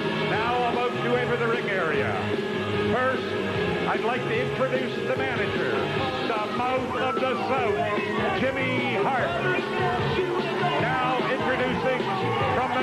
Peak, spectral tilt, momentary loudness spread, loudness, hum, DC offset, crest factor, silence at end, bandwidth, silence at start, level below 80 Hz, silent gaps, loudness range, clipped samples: -12 dBFS; -6 dB/octave; 2 LU; -25 LUFS; none; under 0.1%; 12 dB; 0 s; 13 kHz; 0 s; -52 dBFS; none; 1 LU; under 0.1%